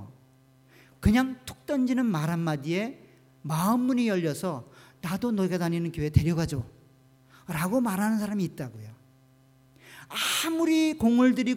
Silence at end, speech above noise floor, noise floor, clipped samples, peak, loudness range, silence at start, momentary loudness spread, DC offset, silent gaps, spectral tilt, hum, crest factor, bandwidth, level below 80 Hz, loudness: 0 s; 33 dB; -59 dBFS; under 0.1%; -6 dBFS; 4 LU; 0 s; 14 LU; under 0.1%; none; -5.5 dB/octave; none; 20 dB; 16.5 kHz; -46 dBFS; -27 LUFS